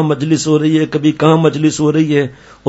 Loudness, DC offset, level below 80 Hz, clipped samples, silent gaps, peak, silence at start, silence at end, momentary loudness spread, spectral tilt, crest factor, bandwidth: -13 LUFS; under 0.1%; -50 dBFS; under 0.1%; none; 0 dBFS; 0 s; 0 s; 4 LU; -6 dB/octave; 12 dB; 8 kHz